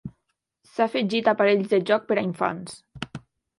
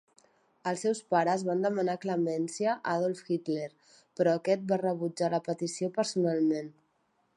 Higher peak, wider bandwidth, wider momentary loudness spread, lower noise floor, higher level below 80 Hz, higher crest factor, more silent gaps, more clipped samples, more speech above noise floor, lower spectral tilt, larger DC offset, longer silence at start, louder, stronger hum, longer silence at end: first, -6 dBFS vs -12 dBFS; about the same, 11.5 kHz vs 11.5 kHz; first, 18 LU vs 8 LU; first, -77 dBFS vs -73 dBFS; first, -62 dBFS vs -82 dBFS; about the same, 20 dB vs 18 dB; neither; neither; first, 54 dB vs 44 dB; about the same, -6 dB/octave vs -5.5 dB/octave; neither; second, 0.05 s vs 0.65 s; first, -23 LUFS vs -30 LUFS; neither; second, 0.4 s vs 0.65 s